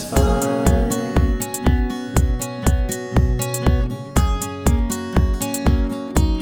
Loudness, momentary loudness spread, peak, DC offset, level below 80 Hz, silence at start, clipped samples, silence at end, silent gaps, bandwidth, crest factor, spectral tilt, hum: -20 LUFS; 4 LU; -2 dBFS; under 0.1%; -22 dBFS; 0 s; under 0.1%; 0 s; none; 20 kHz; 16 dB; -6 dB/octave; none